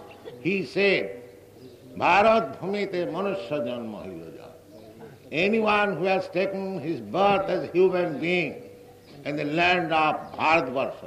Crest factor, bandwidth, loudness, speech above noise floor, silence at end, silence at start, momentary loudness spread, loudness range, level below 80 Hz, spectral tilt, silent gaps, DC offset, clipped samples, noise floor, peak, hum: 18 dB; 14 kHz; -24 LUFS; 23 dB; 0 s; 0 s; 15 LU; 3 LU; -62 dBFS; -6 dB/octave; none; under 0.1%; under 0.1%; -48 dBFS; -6 dBFS; none